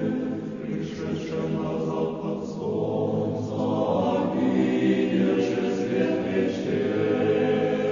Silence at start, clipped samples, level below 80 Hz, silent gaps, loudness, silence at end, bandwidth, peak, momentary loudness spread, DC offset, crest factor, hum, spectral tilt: 0 s; under 0.1%; -60 dBFS; none; -25 LUFS; 0 s; 7.4 kHz; -10 dBFS; 8 LU; under 0.1%; 14 dB; none; -7.5 dB/octave